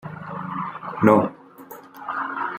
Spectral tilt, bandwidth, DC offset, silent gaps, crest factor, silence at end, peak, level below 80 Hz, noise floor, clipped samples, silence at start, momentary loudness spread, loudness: -8.5 dB/octave; 16 kHz; under 0.1%; none; 22 dB; 0 s; -2 dBFS; -66 dBFS; -43 dBFS; under 0.1%; 0.05 s; 24 LU; -23 LUFS